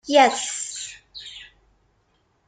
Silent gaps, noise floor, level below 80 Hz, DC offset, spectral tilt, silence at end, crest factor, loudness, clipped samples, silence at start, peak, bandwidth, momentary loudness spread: none; -66 dBFS; -64 dBFS; under 0.1%; -0.5 dB/octave; 1 s; 22 dB; -21 LUFS; under 0.1%; 0.05 s; -2 dBFS; 9.6 kHz; 22 LU